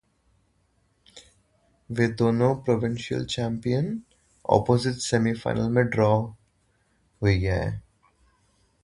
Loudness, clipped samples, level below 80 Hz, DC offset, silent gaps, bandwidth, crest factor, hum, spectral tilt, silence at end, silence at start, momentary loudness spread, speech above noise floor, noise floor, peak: -25 LUFS; under 0.1%; -46 dBFS; under 0.1%; none; 11.5 kHz; 22 dB; none; -6.5 dB/octave; 1.05 s; 1.15 s; 11 LU; 44 dB; -68 dBFS; -4 dBFS